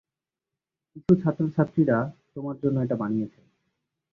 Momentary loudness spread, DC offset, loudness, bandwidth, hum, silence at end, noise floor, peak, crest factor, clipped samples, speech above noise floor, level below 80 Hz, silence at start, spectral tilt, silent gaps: 13 LU; under 0.1%; -25 LUFS; 6.6 kHz; none; 0.85 s; -89 dBFS; -6 dBFS; 22 dB; under 0.1%; 64 dB; -60 dBFS; 0.95 s; -11 dB/octave; none